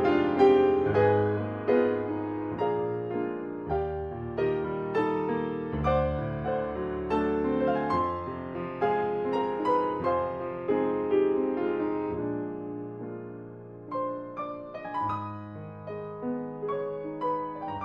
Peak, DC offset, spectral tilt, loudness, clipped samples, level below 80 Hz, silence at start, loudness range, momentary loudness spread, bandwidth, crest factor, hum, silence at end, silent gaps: -8 dBFS; under 0.1%; -9 dB/octave; -29 LUFS; under 0.1%; -50 dBFS; 0 s; 8 LU; 13 LU; 5.8 kHz; 20 dB; none; 0 s; none